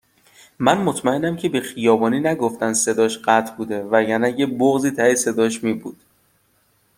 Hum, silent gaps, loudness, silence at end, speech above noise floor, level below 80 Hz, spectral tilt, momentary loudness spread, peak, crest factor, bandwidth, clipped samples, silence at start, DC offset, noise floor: none; none; -19 LUFS; 1.05 s; 43 dB; -62 dBFS; -4 dB/octave; 6 LU; 0 dBFS; 18 dB; 16.5 kHz; under 0.1%; 0.6 s; under 0.1%; -62 dBFS